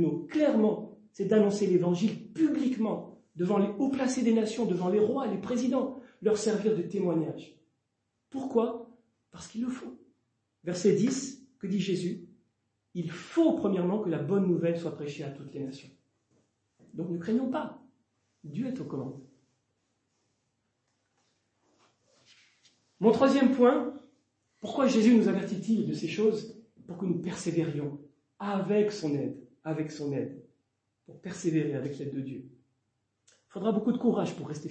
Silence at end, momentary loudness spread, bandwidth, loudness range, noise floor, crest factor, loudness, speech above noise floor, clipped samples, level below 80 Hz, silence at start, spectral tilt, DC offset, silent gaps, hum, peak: 0 s; 17 LU; 8.8 kHz; 9 LU; -80 dBFS; 20 dB; -29 LUFS; 52 dB; under 0.1%; -74 dBFS; 0 s; -6.5 dB/octave; under 0.1%; none; none; -10 dBFS